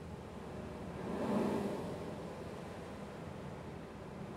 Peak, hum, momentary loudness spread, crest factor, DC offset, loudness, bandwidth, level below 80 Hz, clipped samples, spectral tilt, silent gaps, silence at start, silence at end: -24 dBFS; none; 12 LU; 18 dB; under 0.1%; -43 LUFS; 15.5 kHz; -62 dBFS; under 0.1%; -7 dB/octave; none; 0 s; 0 s